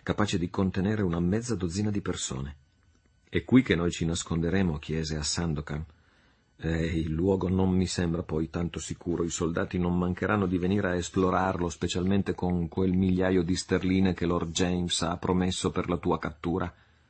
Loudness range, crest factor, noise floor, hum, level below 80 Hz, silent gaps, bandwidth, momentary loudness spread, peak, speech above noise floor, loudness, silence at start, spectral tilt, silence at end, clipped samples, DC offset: 3 LU; 20 dB; -64 dBFS; none; -46 dBFS; none; 8.8 kHz; 7 LU; -8 dBFS; 37 dB; -28 LUFS; 0.05 s; -5.5 dB/octave; 0.4 s; under 0.1%; under 0.1%